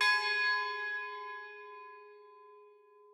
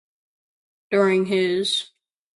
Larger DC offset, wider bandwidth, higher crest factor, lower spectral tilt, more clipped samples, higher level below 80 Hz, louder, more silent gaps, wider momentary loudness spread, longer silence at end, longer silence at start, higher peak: neither; first, 14 kHz vs 11.5 kHz; about the same, 20 dB vs 18 dB; second, 3 dB/octave vs -4.5 dB/octave; neither; second, under -90 dBFS vs -70 dBFS; second, -33 LUFS vs -21 LUFS; neither; first, 23 LU vs 6 LU; about the same, 0.45 s vs 0.5 s; second, 0 s vs 0.9 s; second, -18 dBFS vs -6 dBFS